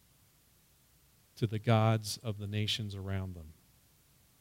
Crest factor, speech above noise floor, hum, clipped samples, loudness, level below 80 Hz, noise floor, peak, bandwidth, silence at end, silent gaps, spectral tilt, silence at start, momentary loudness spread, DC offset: 22 dB; 34 dB; none; under 0.1%; -34 LUFS; -66 dBFS; -67 dBFS; -14 dBFS; 16 kHz; 0.9 s; none; -5.5 dB/octave; 1.35 s; 15 LU; under 0.1%